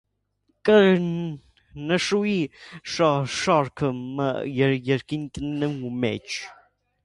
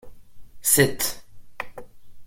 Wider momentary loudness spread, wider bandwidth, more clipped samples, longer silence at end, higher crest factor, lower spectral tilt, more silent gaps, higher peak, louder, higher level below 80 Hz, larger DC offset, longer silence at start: second, 13 LU vs 19 LU; second, 11.5 kHz vs 16.5 kHz; neither; first, 0.5 s vs 0 s; second, 18 dB vs 24 dB; first, -5.5 dB/octave vs -3 dB/octave; neither; second, -6 dBFS vs -2 dBFS; second, -24 LUFS vs -21 LUFS; about the same, -56 dBFS vs -52 dBFS; neither; first, 0.65 s vs 0.05 s